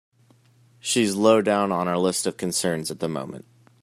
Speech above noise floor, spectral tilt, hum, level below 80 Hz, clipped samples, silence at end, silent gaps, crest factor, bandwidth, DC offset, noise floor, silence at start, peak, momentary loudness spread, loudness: 35 dB; -4 dB/octave; none; -66 dBFS; under 0.1%; 0.45 s; none; 20 dB; 15 kHz; under 0.1%; -58 dBFS; 0.85 s; -4 dBFS; 14 LU; -23 LUFS